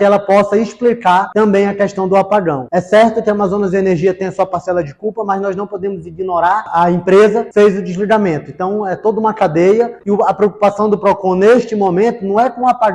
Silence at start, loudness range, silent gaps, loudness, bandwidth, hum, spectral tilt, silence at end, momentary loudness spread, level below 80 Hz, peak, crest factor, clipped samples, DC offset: 0 s; 4 LU; none; -13 LUFS; 10 kHz; none; -7 dB/octave; 0 s; 8 LU; -50 dBFS; -2 dBFS; 10 dB; under 0.1%; under 0.1%